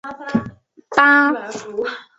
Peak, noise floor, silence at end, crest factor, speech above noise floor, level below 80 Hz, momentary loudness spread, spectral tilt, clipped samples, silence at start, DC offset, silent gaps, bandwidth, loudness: -2 dBFS; -38 dBFS; 0.15 s; 18 dB; 20 dB; -58 dBFS; 14 LU; -5 dB/octave; under 0.1%; 0.05 s; under 0.1%; none; 8 kHz; -17 LUFS